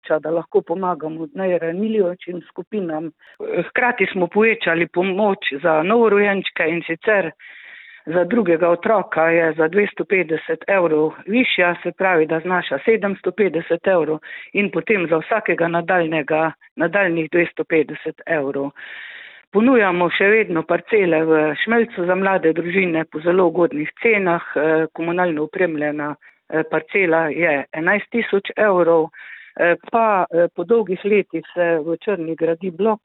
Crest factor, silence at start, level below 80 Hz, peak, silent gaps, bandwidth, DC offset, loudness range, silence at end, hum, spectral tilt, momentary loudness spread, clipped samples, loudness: 16 dB; 0.05 s; -66 dBFS; -4 dBFS; 2.67-2.71 s, 16.71-16.76 s, 19.47-19.52 s; 4.1 kHz; under 0.1%; 3 LU; 0.1 s; none; -10.5 dB/octave; 9 LU; under 0.1%; -18 LUFS